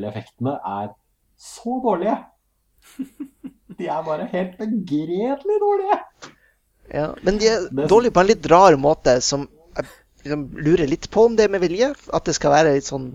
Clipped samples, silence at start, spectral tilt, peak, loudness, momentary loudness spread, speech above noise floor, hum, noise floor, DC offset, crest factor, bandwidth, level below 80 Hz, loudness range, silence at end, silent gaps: under 0.1%; 0 s; -5 dB/octave; 0 dBFS; -19 LUFS; 18 LU; 44 dB; none; -63 dBFS; under 0.1%; 20 dB; 11 kHz; -44 dBFS; 10 LU; 0 s; none